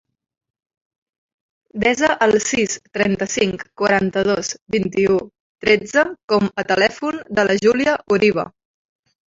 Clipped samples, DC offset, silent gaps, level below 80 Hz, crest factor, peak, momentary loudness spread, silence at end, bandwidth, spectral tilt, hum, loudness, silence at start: under 0.1%; under 0.1%; 4.62-4.66 s, 5.40-5.55 s, 6.23-6.28 s; -52 dBFS; 18 dB; -2 dBFS; 7 LU; 0.8 s; 8 kHz; -4 dB/octave; none; -18 LUFS; 1.75 s